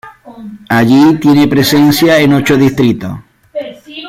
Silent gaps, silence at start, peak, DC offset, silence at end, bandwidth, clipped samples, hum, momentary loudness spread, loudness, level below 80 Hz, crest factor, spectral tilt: none; 0.05 s; 0 dBFS; under 0.1%; 0 s; 16.5 kHz; under 0.1%; none; 19 LU; -8 LUFS; -42 dBFS; 10 dB; -5.5 dB/octave